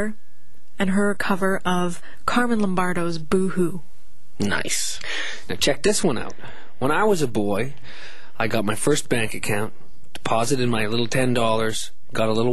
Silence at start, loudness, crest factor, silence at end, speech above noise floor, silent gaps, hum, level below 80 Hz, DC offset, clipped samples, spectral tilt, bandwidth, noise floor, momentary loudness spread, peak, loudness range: 0 s; -23 LUFS; 18 dB; 0 s; 36 dB; none; none; -48 dBFS; 7%; under 0.1%; -4.5 dB/octave; 12.5 kHz; -58 dBFS; 11 LU; -4 dBFS; 2 LU